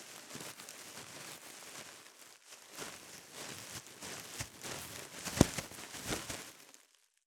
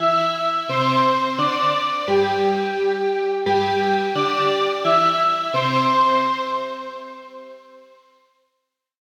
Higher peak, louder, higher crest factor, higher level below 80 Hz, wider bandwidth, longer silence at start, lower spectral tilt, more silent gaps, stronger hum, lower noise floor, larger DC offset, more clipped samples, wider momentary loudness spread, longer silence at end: about the same, -6 dBFS vs -6 dBFS; second, -41 LUFS vs -19 LUFS; first, 36 dB vs 14 dB; first, -58 dBFS vs -70 dBFS; first, over 20 kHz vs 16.5 kHz; about the same, 0 s vs 0 s; second, -3.5 dB/octave vs -5 dB/octave; neither; neither; second, -69 dBFS vs -77 dBFS; neither; neither; first, 19 LU vs 12 LU; second, 0.45 s vs 1.25 s